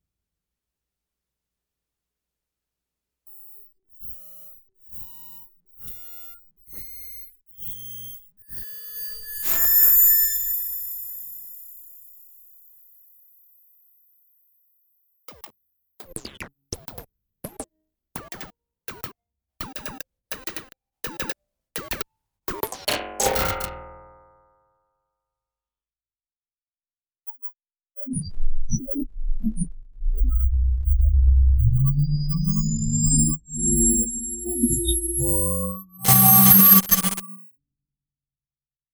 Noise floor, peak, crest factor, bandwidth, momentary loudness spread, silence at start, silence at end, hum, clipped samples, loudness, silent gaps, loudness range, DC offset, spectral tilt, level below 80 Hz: under -90 dBFS; -2 dBFS; 22 dB; over 20 kHz; 26 LU; 3.3 s; 1.5 s; none; under 0.1%; -19 LUFS; 26.36-26.40 s; 25 LU; under 0.1%; -4 dB/octave; -30 dBFS